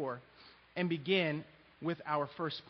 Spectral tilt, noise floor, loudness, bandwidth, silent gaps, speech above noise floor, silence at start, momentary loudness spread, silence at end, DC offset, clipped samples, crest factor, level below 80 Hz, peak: -4 dB/octave; -61 dBFS; -36 LUFS; 6 kHz; none; 25 dB; 0 s; 14 LU; 0 s; under 0.1%; under 0.1%; 20 dB; -76 dBFS; -18 dBFS